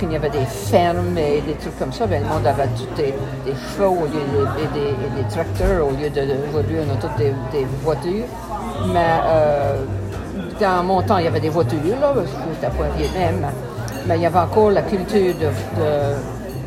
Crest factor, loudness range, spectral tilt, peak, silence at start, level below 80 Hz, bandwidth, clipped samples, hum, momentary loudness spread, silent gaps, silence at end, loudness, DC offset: 18 dB; 2 LU; -7 dB/octave; -2 dBFS; 0 s; -34 dBFS; 16 kHz; under 0.1%; none; 9 LU; none; 0 s; -20 LUFS; under 0.1%